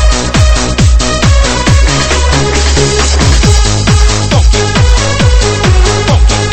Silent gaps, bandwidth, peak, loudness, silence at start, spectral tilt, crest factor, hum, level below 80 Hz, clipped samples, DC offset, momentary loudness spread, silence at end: none; 8.8 kHz; 0 dBFS; -8 LUFS; 0 s; -4 dB/octave; 8 dB; none; -10 dBFS; 1%; 3%; 1 LU; 0 s